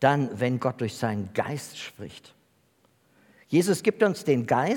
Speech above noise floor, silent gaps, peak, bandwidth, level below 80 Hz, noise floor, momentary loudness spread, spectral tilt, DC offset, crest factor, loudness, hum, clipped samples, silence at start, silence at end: 40 dB; none; -6 dBFS; 18 kHz; -72 dBFS; -65 dBFS; 15 LU; -6 dB/octave; under 0.1%; 22 dB; -26 LUFS; none; under 0.1%; 0 s; 0 s